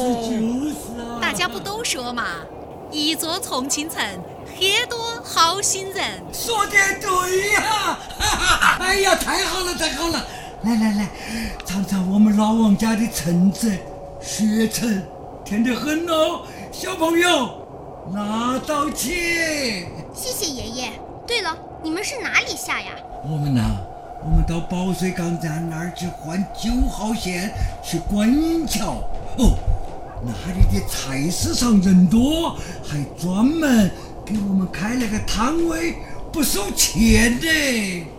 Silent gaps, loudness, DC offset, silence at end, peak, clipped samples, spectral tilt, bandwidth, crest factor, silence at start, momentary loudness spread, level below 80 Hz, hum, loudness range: none; -20 LUFS; under 0.1%; 0 s; 0 dBFS; under 0.1%; -4 dB/octave; 17 kHz; 20 dB; 0 s; 13 LU; -32 dBFS; none; 5 LU